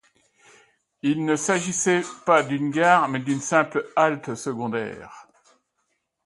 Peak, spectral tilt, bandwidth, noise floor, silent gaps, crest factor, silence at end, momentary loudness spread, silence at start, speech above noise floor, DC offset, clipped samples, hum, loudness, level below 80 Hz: -4 dBFS; -4.5 dB/octave; 11.5 kHz; -74 dBFS; none; 22 dB; 1.05 s; 11 LU; 1.05 s; 52 dB; under 0.1%; under 0.1%; none; -22 LUFS; -68 dBFS